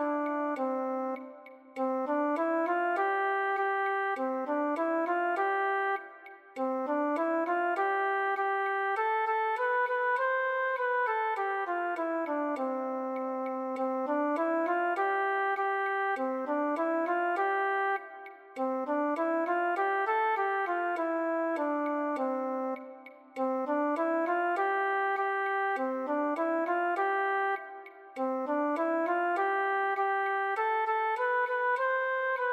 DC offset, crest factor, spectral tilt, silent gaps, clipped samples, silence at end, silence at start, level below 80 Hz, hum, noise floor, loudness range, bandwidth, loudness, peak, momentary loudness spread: under 0.1%; 12 dB; -4 dB/octave; none; under 0.1%; 0 s; 0 s; under -90 dBFS; none; -50 dBFS; 2 LU; 12.5 kHz; -30 LUFS; -18 dBFS; 5 LU